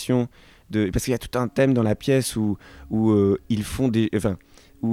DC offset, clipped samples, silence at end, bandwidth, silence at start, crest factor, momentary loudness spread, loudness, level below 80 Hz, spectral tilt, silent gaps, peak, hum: under 0.1%; under 0.1%; 0 s; 16 kHz; 0 s; 16 dB; 9 LU; -23 LUFS; -44 dBFS; -6.5 dB/octave; none; -6 dBFS; none